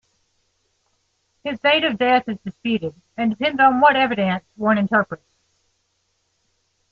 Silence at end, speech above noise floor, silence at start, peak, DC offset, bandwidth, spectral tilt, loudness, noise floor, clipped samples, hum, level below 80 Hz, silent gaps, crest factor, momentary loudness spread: 1.75 s; 50 dB; 1.45 s; -2 dBFS; under 0.1%; 7 kHz; -7 dB/octave; -19 LUFS; -69 dBFS; under 0.1%; none; -64 dBFS; none; 18 dB; 15 LU